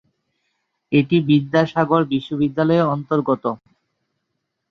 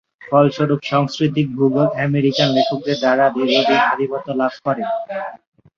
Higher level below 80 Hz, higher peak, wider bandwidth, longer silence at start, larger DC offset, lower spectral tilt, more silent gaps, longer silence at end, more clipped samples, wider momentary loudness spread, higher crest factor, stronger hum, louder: about the same, -62 dBFS vs -60 dBFS; about the same, -2 dBFS vs -2 dBFS; second, 6.4 kHz vs 7.2 kHz; first, 0.9 s vs 0.2 s; neither; first, -8.5 dB/octave vs -6.5 dB/octave; neither; first, 1.15 s vs 0.4 s; neither; about the same, 6 LU vs 7 LU; about the same, 18 dB vs 16 dB; neither; about the same, -19 LUFS vs -17 LUFS